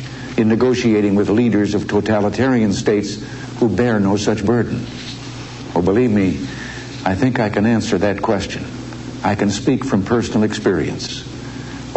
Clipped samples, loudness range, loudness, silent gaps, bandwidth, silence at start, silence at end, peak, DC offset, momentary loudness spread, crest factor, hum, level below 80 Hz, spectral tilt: under 0.1%; 3 LU; -17 LUFS; none; 8.4 kHz; 0 s; 0 s; -4 dBFS; under 0.1%; 14 LU; 14 dB; none; -42 dBFS; -6 dB/octave